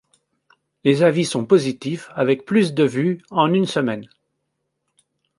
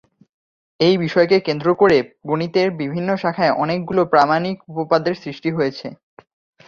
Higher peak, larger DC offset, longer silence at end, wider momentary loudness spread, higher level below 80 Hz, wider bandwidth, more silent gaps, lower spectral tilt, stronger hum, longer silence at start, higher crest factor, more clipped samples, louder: about the same, -2 dBFS vs -2 dBFS; neither; first, 1.35 s vs 0.75 s; about the same, 9 LU vs 9 LU; second, -66 dBFS vs -58 dBFS; first, 11.5 kHz vs 7.2 kHz; neither; about the same, -6 dB/octave vs -7 dB/octave; neither; about the same, 0.85 s vs 0.8 s; about the same, 18 dB vs 18 dB; neither; about the same, -19 LUFS vs -18 LUFS